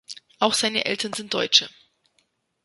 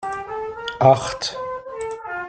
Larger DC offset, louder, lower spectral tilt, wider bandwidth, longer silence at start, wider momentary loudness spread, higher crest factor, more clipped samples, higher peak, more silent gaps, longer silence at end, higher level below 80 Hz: neither; about the same, -21 LUFS vs -22 LUFS; second, -1.5 dB/octave vs -5 dB/octave; first, 12 kHz vs 9.2 kHz; about the same, 0.1 s vs 0 s; about the same, 14 LU vs 14 LU; about the same, 24 dB vs 20 dB; neither; about the same, -2 dBFS vs -2 dBFS; neither; first, 0.95 s vs 0 s; second, -68 dBFS vs -52 dBFS